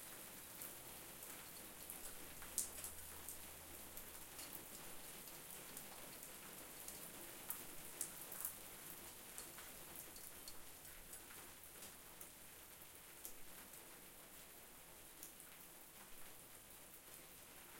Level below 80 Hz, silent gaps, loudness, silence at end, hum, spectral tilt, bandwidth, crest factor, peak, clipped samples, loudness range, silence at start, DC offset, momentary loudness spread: -72 dBFS; none; -53 LUFS; 0 s; none; -1.5 dB/octave; 17 kHz; 38 dB; -18 dBFS; under 0.1%; 7 LU; 0 s; under 0.1%; 10 LU